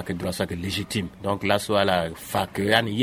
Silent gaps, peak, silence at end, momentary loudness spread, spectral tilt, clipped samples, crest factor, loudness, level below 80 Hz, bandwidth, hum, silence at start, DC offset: none; -4 dBFS; 0 s; 7 LU; -4.5 dB/octave; under 0.1%; 22 dB; -25 LUFS; -50 dBFS; 16 kHz; none; 0 s; under 0.1%